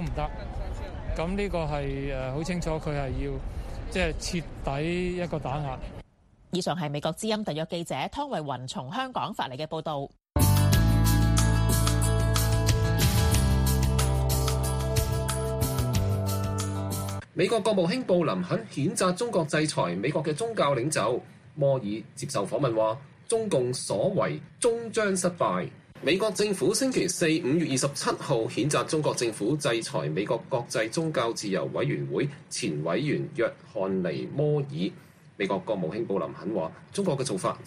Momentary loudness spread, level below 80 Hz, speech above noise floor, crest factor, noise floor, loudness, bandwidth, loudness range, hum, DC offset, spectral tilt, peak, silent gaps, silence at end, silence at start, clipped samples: 9 LU; -36 dBFS; 30 dB; 18 dB; -58 dBFS; -28 LUFS; 15.5 kHz; 7 LU; none; under 0.1%; -5 dB/octave; -10 dBFS; none; 0 s; 0 s; under 0.1%